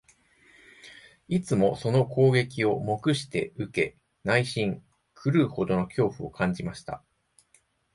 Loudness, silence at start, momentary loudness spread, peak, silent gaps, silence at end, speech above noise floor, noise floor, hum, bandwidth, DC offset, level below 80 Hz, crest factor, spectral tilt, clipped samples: -27 LUFS; 0.85 s; 16 LU; -8 dBFS; none; 1 s; 40 dB; -66 dBFS; none; 11.5 kHz; under 0.1%; -58 dBFS; 20 dB; -6.5 dB/octave; under 0.1%